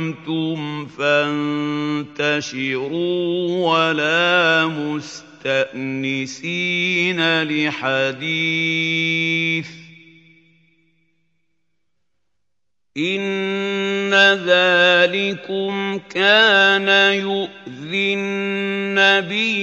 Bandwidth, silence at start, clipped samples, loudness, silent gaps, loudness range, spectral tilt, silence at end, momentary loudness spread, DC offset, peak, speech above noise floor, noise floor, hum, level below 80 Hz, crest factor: 8.2 kHz; 0 s; under 0.1%; -18 LUFS; none; 10 LU; -4.5 dB/octave; 0 s; 11 LU; under 0.1%; -2 dBFS; 63 dB; -82 dBFS; none; -70 dBFS; 18 dB